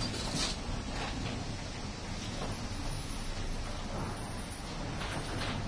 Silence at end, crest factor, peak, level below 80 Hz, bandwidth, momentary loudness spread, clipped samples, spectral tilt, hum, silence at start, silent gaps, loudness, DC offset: 0 s; 16 dB; -20 dBFS; -42 dBFS; 11 kHz; 6 LU; under 0.1%; -4 dB/octave; none; 0 s; none; -38 LUFS; under 0.1%